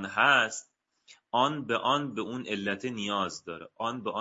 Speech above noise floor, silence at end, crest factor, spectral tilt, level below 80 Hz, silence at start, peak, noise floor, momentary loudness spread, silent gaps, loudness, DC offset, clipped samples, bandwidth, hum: 31 dB; 0 s; 22 dB; -1.5 dB/octave; -76 dBFS; 0 s; -8 dBFS; -60 dBFS; 13 LU; none; -29 LUFS; under 0.1%; under 0.1%; 7.6 kHz; none